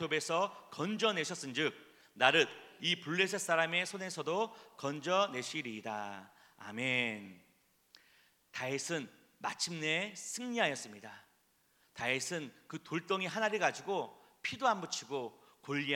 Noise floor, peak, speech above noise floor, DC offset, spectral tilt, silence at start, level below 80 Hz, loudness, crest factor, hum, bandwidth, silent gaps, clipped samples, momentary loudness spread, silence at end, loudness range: -73 dBFS; -10 dBFS; 37 dB; under 0.1%; -3 dB/octave; 0 s; -84 dBFS; -35 LUFS; 28 dB; none; 19 kHz; none; under 0.1%; 16 LU; 0 s; 7 LU